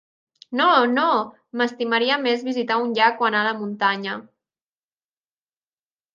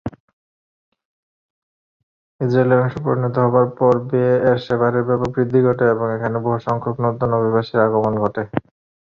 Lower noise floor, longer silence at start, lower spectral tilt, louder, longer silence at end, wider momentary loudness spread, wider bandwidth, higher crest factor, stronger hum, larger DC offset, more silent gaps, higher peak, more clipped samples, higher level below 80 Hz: about the same, under -90 dBFS vs under -90 dBFS; first, 0.5 s vs 0.05 s; second, -5 dB/octave vs -9.5 dB/octave; second, -21 LUFS vs -18 LUFS; first, 1.9 s vs 0.45 s; first, 10 LU vs 6 LU; about the same, 7.4 kHz vs 6.8 kHz; about the same, 20 dB vs 16 dB; neither; neither; second, none vs 0.20-0.92 s, 1.05-2.39 s; about the same, -4 dBFS vs -2 dBFS; neither; second, -78 dBFS vs -52 dBFS